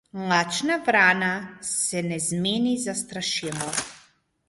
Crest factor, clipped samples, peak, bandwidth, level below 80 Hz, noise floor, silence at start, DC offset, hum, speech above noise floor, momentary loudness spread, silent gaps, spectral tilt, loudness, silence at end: 20 dB; under 0.1%; -6 dBFS; 12 kHz; -64 dBFS; -59 dBFS; 0.15 s; under 0.1%; none; 35 dB; 10 LU; none; -3 dB/octave; -24 LUFS; 0.5 s